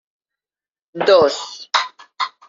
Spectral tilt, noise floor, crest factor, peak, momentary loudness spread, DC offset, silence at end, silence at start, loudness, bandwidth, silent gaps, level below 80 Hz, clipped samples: -0.5 dB/octave; under -90 dBFS; 20 dB; 0 dBFS; 16 LU; under 0.1%; 0.2 s; 0.95 s; -17 LUFS; 7.6 kHz; none; -66 dBFS; under 0.1%